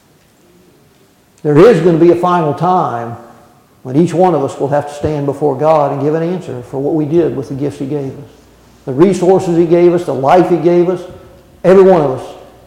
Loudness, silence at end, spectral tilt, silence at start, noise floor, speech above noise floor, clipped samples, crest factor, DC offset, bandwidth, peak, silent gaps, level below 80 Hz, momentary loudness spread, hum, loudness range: -12 LUFS; 0.25 s; -8 dB/octave; 1.45 s; -49 dBFS; 38 dB; under 0.1%; 12 dB; under 0.1%; 11 kHz; 0 dBFS; none; -48 dBFS; 15 LU; none; 4 LU